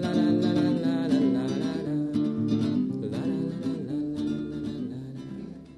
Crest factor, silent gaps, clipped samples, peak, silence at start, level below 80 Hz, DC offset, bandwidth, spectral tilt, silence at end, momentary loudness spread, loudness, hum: 14 dB; none; under 0.1%; -14 dBFS; 0 s; -60 dBFS; under 0.1%; 10.5 kHz; -8 dB/octave; 0 s; 12 LU; -27 LUFS; none